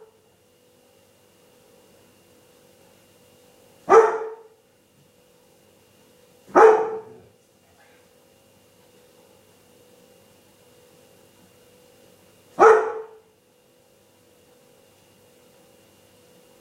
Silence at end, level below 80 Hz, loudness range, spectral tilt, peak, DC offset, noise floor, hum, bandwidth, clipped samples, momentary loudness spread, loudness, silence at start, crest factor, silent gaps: 3.55 s; -70 dBFS; 1 LU; -4.5 dB/octave; -2 dBFS; under 0.1%; -59 dBFS; none; 12 kHz; under 0.1%; 26 LU; -17 LUFS; 3.9 s; 24 dB; none